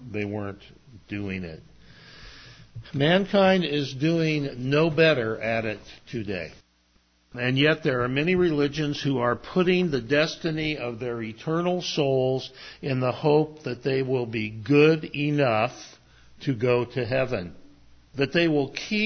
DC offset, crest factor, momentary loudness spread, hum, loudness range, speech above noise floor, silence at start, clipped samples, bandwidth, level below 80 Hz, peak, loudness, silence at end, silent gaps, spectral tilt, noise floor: under 0.1%; 18 dB; 15 LU; none; 4 LU; 40 dB; 0 s; under 0.1%; 6.6 kHz; -54 dBFS; -6 dBFS; -25 LUFS; 0 s; none; -6.5 dB/octave; -64 dBFS